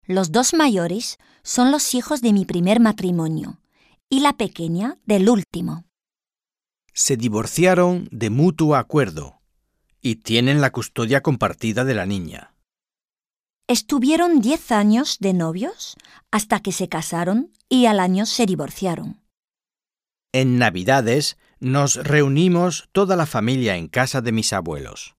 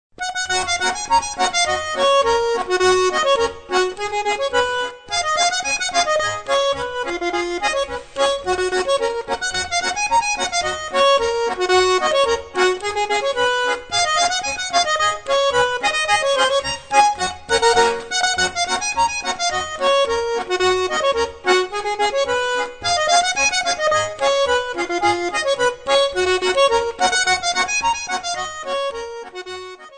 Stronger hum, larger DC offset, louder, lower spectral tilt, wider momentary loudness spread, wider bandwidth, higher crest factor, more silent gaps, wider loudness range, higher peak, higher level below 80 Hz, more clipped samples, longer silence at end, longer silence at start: neither; neither; about the same, -19 LUFS vs -18 LUFS; first, -5 dB/octave vs -1.5 dB/octave; first, 11 LU vs 7 LU; first, 15.5 kHz vs 9.4 kHz; about the same, 18 dB vs 16 dB; first, 4.03-4.07 s vs none; about the same, 3 LU vs 3 LU; about the same, -2 dBFS vs -2 dBFS; second, -52 dBFS vs -46 dBFS; neither; about the same, 0.1 s vs 0 s; about the same, 0.1 s vs 0.2 s